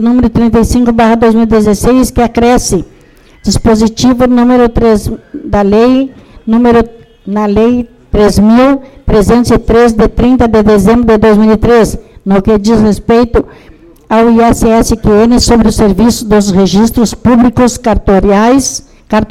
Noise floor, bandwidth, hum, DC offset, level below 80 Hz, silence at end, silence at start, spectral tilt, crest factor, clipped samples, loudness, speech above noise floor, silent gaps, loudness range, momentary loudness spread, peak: -39 dBFS; 15 kHz; none; 0.4%; -22 dBFS; 0.05 s; 0 s; -6 dB/octave; 6 dB; under 0.1%; -8 LUFS; 33 dB; none; 2 LU; 8 LU; 0 dBFS